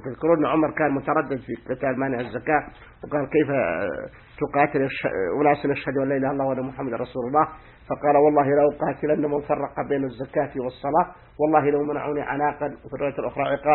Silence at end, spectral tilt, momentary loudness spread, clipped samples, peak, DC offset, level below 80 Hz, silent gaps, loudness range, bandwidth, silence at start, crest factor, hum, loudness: 0 s; -11.5 dB/octave; 9 LU; under 0.1%; -4 dBFS; under 0.1%; -52 dBFS; none; 2 LU; 4.2 kHz; 0 s; 20 dB; none; -24 LUFS